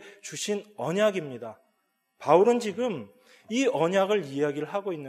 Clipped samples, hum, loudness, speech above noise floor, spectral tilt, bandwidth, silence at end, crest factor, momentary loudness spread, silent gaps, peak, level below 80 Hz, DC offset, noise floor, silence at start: under 0.1%; none; -26 LUFS; 48 dB; -5 dB/octave; 14.5 kHz; 0 s; 20 dB; 17 LU; none; -6 dBFS; -82 dBFS; under 0.1%; -74 dBFS; 0 s